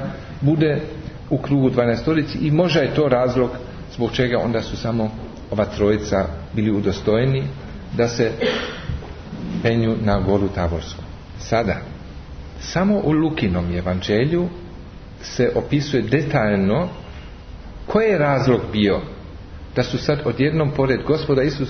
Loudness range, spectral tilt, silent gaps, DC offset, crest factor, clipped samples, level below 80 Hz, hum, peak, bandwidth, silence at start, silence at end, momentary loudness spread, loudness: 3 LU; -7 dB/octave; none; under 0.1%; 16 dB; under 0.1%; -38 dBFS; none; -4 dBFS; 6.6 kHz; 0 s; 0 s; 18 LU; -20 LUFS